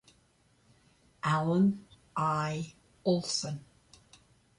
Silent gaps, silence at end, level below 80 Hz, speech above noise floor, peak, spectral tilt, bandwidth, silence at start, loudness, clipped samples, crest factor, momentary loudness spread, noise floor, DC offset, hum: none; 1 s; -66 dBFS; 38 dB; -18 dBFS; -5.5 dB/octave; 11.5 kHz; 1.25 s; -31 LUFS; under 0.1%; 16 dB; 14 LU; -68 dBFS; under 0.1%; none